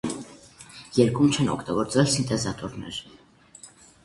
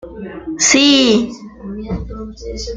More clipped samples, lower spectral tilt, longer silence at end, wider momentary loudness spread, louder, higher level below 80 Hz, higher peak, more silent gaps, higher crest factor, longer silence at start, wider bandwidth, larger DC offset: neither; first, -5 dB/octave vs -2.5 dB/octave; first, 0.4 s vs 0 s; about the same, 23 LU vs 21 LU; second, -24 LUFS vs -12 LUFS; second, -54 dBFS vs -34 dBFS; second, -6 dBFS vs 0 dBFS; neither; about the same, 20 dB vs 16 dB; about the same, 0.05 s vs 0.05 s; first, 11.5 kHz vs 9.6 kHz; neither